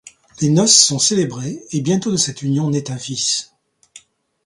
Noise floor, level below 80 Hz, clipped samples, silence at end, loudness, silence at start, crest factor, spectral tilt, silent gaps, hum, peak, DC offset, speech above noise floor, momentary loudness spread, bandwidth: -47 dBFS; -58 dBFS; under 0.1%; 0.5 s; -16 LUFS; 0.05 s; 18 dB; -3.5 dB/octave; none; none; 0 dBFS; under 0.1%; 30 dB; 13 LU; 11.5 kHz